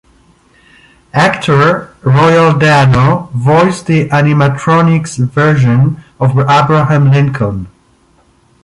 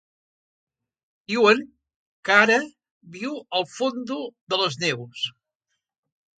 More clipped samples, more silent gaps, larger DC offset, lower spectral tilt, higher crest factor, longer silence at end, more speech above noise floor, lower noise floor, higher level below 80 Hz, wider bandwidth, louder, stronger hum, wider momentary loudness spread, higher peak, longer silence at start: neither; second, none vs 1.96-2.23 s, 2.91-3.01 s, 4.41-4.47 s; neither; first, -7 dB/octave vs -3.5 dB/octave; second, 10 dB vs 24 dB; second, 0.95 s vs 1.1 s; second, 41 dB vs 57 dB; second, -49 dBFS vs -80 dBFS; first, -40 dBFS vs -74 dBFS; first, 11 kHz vs 9.2 kHz; first, -10 LUFS vs -22 LUFS; neither; second, 7 LU vs 15 LU; about the same, 0 dBFS vs 0 dBFS; second, 1.15 s vs 1.3 s